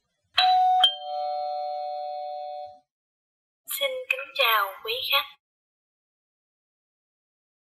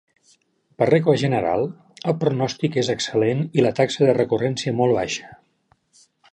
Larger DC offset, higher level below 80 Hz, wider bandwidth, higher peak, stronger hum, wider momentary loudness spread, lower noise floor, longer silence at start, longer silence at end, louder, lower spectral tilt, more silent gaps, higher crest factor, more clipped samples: neither; second, -80 dBFS vs -58 dBFS; first, 16 kHz vs 10 kHz; second, -8 dBFS vs -4 dBFS; neither; first, 16 LU vs 7 LU; first, under -90 dBFS vs -64 dBFS; second, 0.35 s vs 0.8 s; first, 2.4 s vs 1 s; second, -24 LUFS vs -21 LUFS; second, 2 dB/octave vs -6 dB/octave; first, 2.91-3.64 s vs none; about the same, 22 dB vs 18 dB; neither